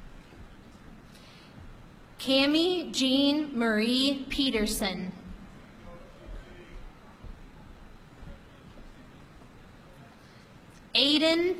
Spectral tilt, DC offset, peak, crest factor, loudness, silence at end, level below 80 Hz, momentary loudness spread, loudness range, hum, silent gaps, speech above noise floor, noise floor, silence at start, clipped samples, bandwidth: -3.5 dB/octave; under 0.1%; -10 dBFS; 20 dB; -26 LUFS; 0 s; -50 dBFS; 27 LU; 23 LU; none; none; 26 dB; -52 dBFS; 0 s; under 0.1%; 16 kHz